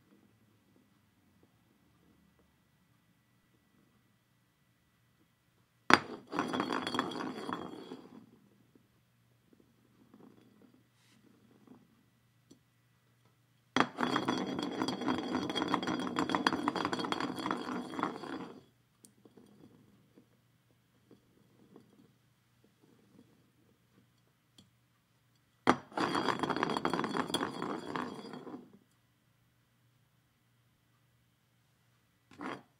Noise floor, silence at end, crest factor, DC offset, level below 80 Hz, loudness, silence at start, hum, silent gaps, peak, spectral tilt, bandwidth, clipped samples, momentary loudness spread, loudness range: -73 dBFS; 0.2 s; 40 dB; under 0.1%; -82 dBFS; -35 LUFS; 5.9 s; none; none; 0 dBFS; -4.5 dB/octave; 16 kHz; under 0.1%; 15 LU; 14 LU